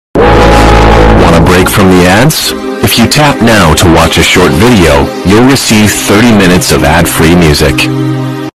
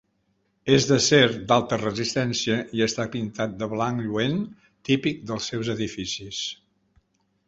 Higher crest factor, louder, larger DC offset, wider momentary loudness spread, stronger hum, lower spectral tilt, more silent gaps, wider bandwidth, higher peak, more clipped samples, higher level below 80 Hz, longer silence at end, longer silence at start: second, 4 dB vs 22 dB; first, -4 LUFS vs -24 LUFS; neither; second, 4 LU vs 12 LU; neither; about the same, -4.5 dB/octave vs -4.5 dB/octave; neither; first, 16.5 kHz vs 8 kHz; first, 0 dBFS vs -4 dBFS; first, 5% vs under 0.1%; first, -16 dBFS vs -56 dBFS; second, 0.1 s vs 0.95 s; second, 0.15 s vs 0.65 s